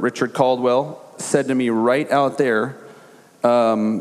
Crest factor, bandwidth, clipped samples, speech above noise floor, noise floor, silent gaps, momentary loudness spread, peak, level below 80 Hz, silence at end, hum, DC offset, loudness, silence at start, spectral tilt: 18 dB; 13.5 kHz; under 0.1%; 28 dB; -47 dBFS; none; 5 LU; -2 dBFS; -76 dBFS; 0 s; none; under 0.1%; -19 LUFS; 0 s; -5.5 dB/octave